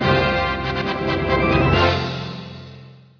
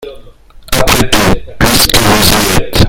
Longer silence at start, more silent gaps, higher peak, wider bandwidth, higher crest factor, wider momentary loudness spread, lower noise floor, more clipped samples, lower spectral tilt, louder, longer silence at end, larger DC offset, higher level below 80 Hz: about the same, 0 s vs 0 s; neither; second, -4 dBFS vs 0 dBFS; second, 5.4 kHz vs over 20 kHz; first, 16 dB vs 10 dB; first, 18 LU vs 6 LU; first, -42 dBFS vs -34 dBFS; second, under 0.1% vs 2%; first, -7 dB/octave vs -3.5 dB/octave; second, -19 LUFS vs -8 LUFS; first, 0.25 s vs 0 s; neither; second, -34 dBFS vs -20 dBFS